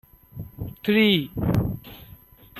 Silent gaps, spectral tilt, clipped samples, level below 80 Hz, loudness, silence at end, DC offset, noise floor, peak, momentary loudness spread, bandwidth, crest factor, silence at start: none; -7 dB/octave; under 0.1%; -44 dBFS; -22 LUFS; 0 s; under 0.1%; -49 dBFS; -6 dBFS; 23 LU; 13.5 kHz; 18 dB; 0.35 s